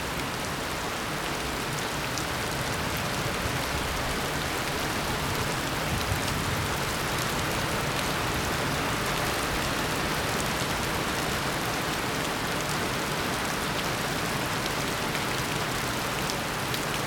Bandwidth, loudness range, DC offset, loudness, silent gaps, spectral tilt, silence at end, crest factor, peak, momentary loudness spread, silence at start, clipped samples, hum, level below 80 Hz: 19 kHz; 2 LU; under 0.1%; -28 LUFS; none; -3.5 dB/octave; 0 s; 20 dB; -8 dBFS; 2 LU; 0 s; under 0.1%; none; -44 dBFS